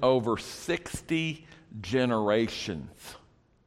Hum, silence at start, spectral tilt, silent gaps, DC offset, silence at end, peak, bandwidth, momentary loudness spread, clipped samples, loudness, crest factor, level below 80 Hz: none; 0 s; -5 dB/octave; none; under 0.1%; 0.5 s; -10 dBFS; 15.5 kHz; 19 LU; under 0.1%; -29 LUFS; 20 dB; -56 dBFS